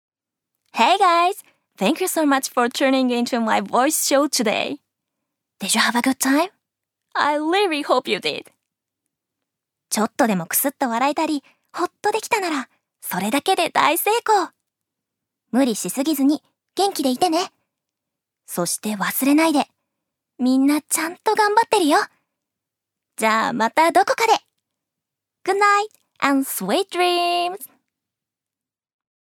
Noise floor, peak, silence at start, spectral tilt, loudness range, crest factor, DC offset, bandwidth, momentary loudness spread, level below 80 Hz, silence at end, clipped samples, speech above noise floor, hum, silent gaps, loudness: -89 dBFS; -2 dBFS; 0.75 s; -3 dB/octave; 4 LU; 20 dB; under 0.1%; 19.5 kHz; 11 LU; -76 dBFS; 1.7 s; under 0.1%; 69 dB; none; none; -20 LUFS